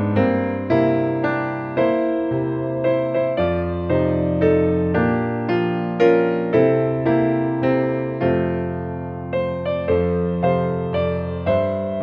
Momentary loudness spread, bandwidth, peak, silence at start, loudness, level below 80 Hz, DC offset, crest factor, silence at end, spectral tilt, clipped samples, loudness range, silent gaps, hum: 6 LU; 5.8 kHz; -4 dBFS; 0 s; -20 LUFS; -44 dBFS; under 0.1%; 16 dB; 0 s; -10 dB/octave; under 0.1%; 3 LU; none; none